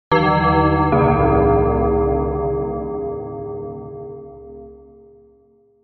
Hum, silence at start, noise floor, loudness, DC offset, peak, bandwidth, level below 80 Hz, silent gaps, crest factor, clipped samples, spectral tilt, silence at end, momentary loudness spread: none; 0.1 s; -55 dBFS; -18 LUFS; under 0.1%; -2 dBFS; 6 kHz; -30 dBFS; none; 16 dB; under 0.1%; -6.5 dB/octave; 1.1 s; 21 LU